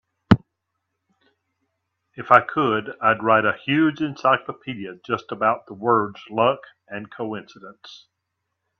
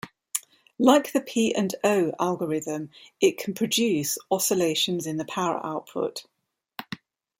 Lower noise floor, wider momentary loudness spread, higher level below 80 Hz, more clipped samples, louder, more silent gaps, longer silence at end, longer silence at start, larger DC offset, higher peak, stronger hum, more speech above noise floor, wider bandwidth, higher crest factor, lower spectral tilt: first, -79 dBFS vs -44 dBFS; about the same, 18 LU vs 16 LU; first, -56 dBFS vs -70 dBFS; neither; first, -21 LUFS vs -25 LUFS; neither; first, 0.85 s vs 0.45 s; first, 0.3 s vs 0.05 s; neither; first, 0 dBFS vs -4 dBFS; neither; first, 57 dB vs 19 dB; second, 7.2 kHz vs 16.5 kHz; about the same, 22 dB vs 22 dB; first, -7.5 dB/octave vs -3.5 dB/octave